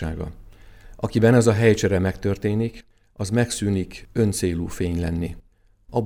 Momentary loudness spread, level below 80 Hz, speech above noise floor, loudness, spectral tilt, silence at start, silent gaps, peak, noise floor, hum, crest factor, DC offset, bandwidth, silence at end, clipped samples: 14 LU; -40 dBFS; 28 dB; -22 LUFS; -6 dB/octave; 0 s; none; -2 dBFS; -49 dBFS; none; 20 dB; under 0.1%; 15 kHz; 0 s; under 0.1%